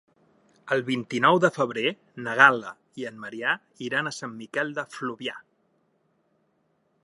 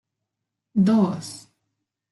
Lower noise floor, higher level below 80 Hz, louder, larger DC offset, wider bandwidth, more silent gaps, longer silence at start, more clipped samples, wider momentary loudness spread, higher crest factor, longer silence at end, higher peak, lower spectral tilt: second, -70 dBFS vs -83 dBFS; second, -78 dBFS vs -66 dBFS; second, -25 LUFS vs -21 LUFS; neither; about the same, 11.5 kHz vs 12 kHz; neither; about the same, 0.65 s vs 0.75 s; neither; about the same, 18 LU vs 19 LU; first, 26 dB vs 16 dB; first, 1.65 s vs 0.7 s; first, -2 dBFS vs -8 dBFS; second, -4.5 dB/octave vs -7 dB/octave